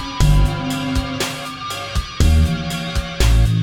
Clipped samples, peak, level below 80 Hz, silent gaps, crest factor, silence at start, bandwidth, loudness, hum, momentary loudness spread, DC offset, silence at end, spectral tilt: under 0.1%; -2 dBFS; -20 dBFS; none; 16 dB; 0 s; 17.5 kHz; -19 LUFS; none; 9 LU; under 0.1%; 0 s; -5 dB/octave